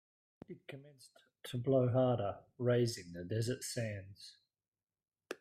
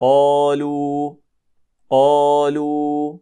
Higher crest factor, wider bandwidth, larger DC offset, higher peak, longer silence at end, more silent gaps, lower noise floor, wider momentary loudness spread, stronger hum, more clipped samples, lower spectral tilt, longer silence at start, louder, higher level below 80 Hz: about the same, 18 dB vs 14 dB; first, 14.5 kHz vs 10 kHz; neither; second, -20 dBFS vs -4 dBFS; about the same, 0.05 s vs 0.05 s; first, 4.68-4.72 s vs none; first, under -90 dBFS vs -62 dBFS; first, 22 LU vs 9 LU; neither; neither; about the same, -6 dB/octave vs -6.5 dB/octave; first, 0.5 s vs 0 s; second, -36 LUFS vs -17 LUFS; about the same, -74 dBFS vs -72 dBFS